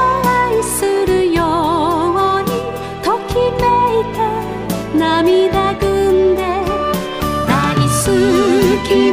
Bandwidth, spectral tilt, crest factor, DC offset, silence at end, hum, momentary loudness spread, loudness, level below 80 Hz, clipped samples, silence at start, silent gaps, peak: 16 kHz; -5 dB/octave; 14 dB; under 0.1%; 0 s; none; 6 LU; -15 LUFS; -32 dBFS; under 0.1%; 0 s; none; 0 dBFS